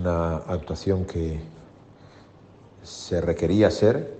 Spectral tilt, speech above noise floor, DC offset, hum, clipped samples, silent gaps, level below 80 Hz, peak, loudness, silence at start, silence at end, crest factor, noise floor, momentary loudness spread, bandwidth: -7 dB/octave; 27 dB; under 0.1%; none; under 0.1%; none; -46 dBFS; -6 dBFS; -24 LUFS; 0 s; 0 s; 20 dB; -50 dBFS; 17 LU; 8.8 kHz